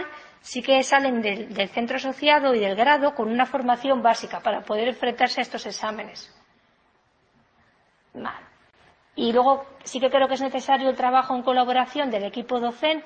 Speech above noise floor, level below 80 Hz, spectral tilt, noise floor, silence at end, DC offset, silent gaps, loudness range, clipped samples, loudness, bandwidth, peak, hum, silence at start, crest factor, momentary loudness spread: 41 dB; -66 dBFS; -3 dB/octave; -64 dBFS; 0 s; under 0.1%; none; 12 LU; under 0.1%; -23 LUFS; 8.8 kHz; -4 dBFS; none; 0 s; 20 dB; 15 LU